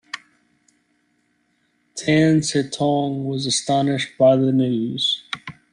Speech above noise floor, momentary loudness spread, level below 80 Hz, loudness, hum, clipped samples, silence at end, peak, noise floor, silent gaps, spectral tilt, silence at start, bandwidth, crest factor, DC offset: 47 dB; 16 LU; -60 dBFS; -19 LUFS; none; under 0.1%; 0.2 s; -4 dBFS; -66 dBFS; none; -5 dB/octave; 0.15 s; 11 kHz; 16 dB; under 0.1%